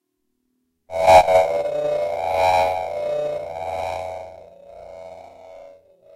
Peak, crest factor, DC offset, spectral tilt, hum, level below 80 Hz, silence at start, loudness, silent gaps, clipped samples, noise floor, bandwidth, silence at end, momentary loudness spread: -2 dBFS; 20 dB; under 0.1%; -3.5 dB/octave; none; -50 dBFS; 0.9 s; -19 LUFS; none; under 0.1%; -73 dBFS; 16 kHz; 0.45 s; 26 LU